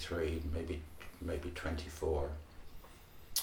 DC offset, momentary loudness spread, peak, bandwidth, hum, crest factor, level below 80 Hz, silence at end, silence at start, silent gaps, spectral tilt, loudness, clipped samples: under 0.1%; 20 LU; -18 dBFS; 20 kHz; none; 22 dB; -46 dBFS; 0 s; 0 s; none; -4.5 dB/octave; -40 LUFS; under 0.1%